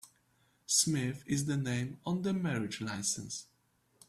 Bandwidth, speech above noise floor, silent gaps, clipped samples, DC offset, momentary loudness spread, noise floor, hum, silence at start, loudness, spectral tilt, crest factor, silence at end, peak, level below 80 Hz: 15.5 kHz; 38 dB; none; under 0.1%; under 0.1%; 10 LU; -72 dBFS; none; 0.05 s; -33 LUFS; -3.5 dB/octave; 22 dB; 0.65 s; -14 dBFS; -68 dBFS